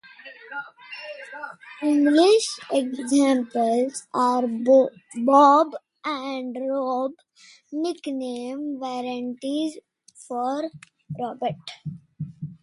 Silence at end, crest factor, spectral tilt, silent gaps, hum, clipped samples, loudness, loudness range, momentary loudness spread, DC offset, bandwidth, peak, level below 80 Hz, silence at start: 0.1 s; 20 dB; -5 dB/octave; none; none; under 0.1%; -23 LUFS; 10 LU; 20 LU; under 0.1%; 11.5 kHz; -4 dBFS; -72 dBFS; 0.25 s